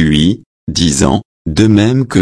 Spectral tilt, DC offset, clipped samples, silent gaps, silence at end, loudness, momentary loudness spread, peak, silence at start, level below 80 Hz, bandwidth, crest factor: -5 dB/octave; under 0.1%; under 0.1%; 0.46-0.67 s, 1.25-1.45 s; 0 s; -12 LUFS; 10 LU; 0 dBFS; 0 s; -30 dBFS; 11 kHz; 12 dB